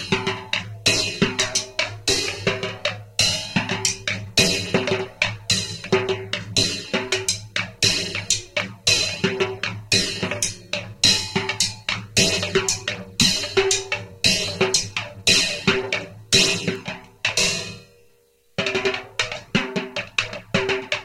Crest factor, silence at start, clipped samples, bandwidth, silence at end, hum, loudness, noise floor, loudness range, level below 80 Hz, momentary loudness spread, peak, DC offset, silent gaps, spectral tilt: 22 dB; 0 s; under 0.1%; 16.5 kHz; 0 s; none; -21 LUFS; -58 dBFS; 3 LU; -48 dBFS; 9 LU; -2 dBFS; under 0.1%; none; -2 dB/octave